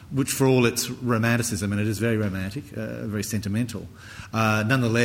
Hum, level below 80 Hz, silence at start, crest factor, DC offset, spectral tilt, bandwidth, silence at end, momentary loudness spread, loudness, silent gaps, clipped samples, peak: none; -52 dBFS; 0 s; 18 dB; under 0.1%; -5 dB/octave; 17 kHz; 0 s; 12 LU; -24 LUFS; none; under 0.1%; -6 dBFS